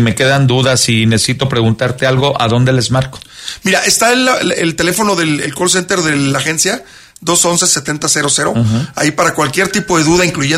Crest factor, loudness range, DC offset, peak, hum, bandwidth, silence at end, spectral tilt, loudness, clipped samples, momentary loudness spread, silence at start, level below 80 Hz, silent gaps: 12 dB; 1 LU; under 0.1%; 0 dBFS; none; 16 kHz; 0 s; -3.5 dB/octave; -12 LUFS; under 0.1%; 5 LU; 0 s; -42 dBFS; none